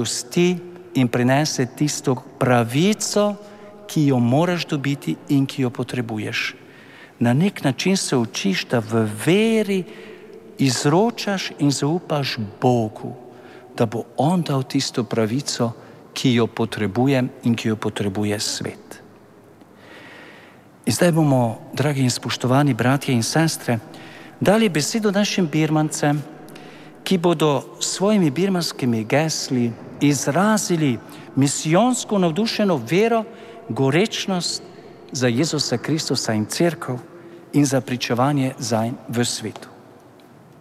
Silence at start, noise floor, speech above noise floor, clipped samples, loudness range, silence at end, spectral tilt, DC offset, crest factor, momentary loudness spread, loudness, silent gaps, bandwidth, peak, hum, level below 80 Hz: 0 s; -47 dBFS; 27 dB; under 0.1%; 3 LU; 0.8 s; -5 dB/octave; under 0.1%; 18 dB; 13 LU; -20 LUFS; none; 15.5 kHz; -4 dBFS; none; -64 dBFS